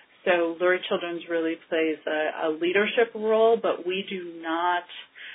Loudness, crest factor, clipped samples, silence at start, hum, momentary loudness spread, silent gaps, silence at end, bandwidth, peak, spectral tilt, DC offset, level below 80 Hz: -25 LUFS; 18 dB; under 0.1%; 0.25 s; none; 8 LU; none; 0 s; 4 kHz; -8 dBFS; -8.5 dB/octave; under 0.1%; -76 dBFS